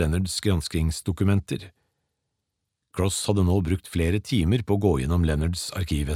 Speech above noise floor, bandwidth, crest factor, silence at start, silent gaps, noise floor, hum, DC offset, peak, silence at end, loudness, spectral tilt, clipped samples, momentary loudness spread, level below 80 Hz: 57 dB; 15 kHz; 18 dB; 0 s; none; -81 dBFS; none; under 0.1%; -6 dBFS; 0 s; -25 LUFS; -6 dB/octave; under 0.1%; 5 LU; -36 dBFS